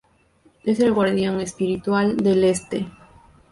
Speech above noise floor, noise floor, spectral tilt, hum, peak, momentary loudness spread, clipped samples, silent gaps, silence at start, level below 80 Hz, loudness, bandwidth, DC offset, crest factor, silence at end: 38 dB; -58 dBFS; -6 dB/octave; none; -8 dBFS; 11 LU; under 0.1%; none; 0.65 s; -54 dBFS; -21 LUFS; 11.5 kHz; under 0.1%; 14 dB; 0.6 s